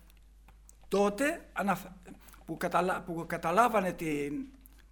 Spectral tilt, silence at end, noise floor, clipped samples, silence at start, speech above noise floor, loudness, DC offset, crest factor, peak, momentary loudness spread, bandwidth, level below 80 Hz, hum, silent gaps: -5.5 dB/octave; 0.35 s; -56 dBFS; under 0.1%; 0.5 s; 25 dB; -31 LUFS; under 0.1%; 20 dB; -12 dBFS; 21 LU; over 20 kHz; -56 dBFS; none; none